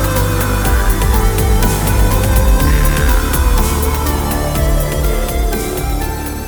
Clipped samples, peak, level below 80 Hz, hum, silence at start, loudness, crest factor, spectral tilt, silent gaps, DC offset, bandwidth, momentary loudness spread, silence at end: under 0.1%; 0 dBFS; -14 dBFS; none; 0 s; -15 LUFS; 12 dB; -5 dB/octave; none; under 0.1%; over 20 kHz; 5 LU; 0 s